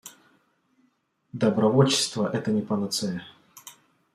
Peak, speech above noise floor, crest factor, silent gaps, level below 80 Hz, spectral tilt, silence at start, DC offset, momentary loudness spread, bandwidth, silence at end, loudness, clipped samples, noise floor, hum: -6 dBFS; 45 dB; 22 dB; none; -68 dBFS; -5 dB/octave; 0.05 s; under 0.1%; 25 LU; 15.5 kHz; 0.45 s; -24 LUFS; under 0.1%; -69 dBFS; none